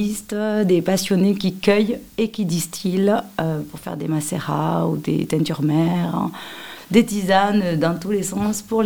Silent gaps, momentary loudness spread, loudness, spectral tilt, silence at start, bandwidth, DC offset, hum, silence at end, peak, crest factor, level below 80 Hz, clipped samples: none; 7 LU; -20 LUFS; -5.5 dB/octave; 0 s; 18 kHz; 0.3%; none; 0 s; -2 dBFS; 18 dB; -54 dBFS; under 0.1%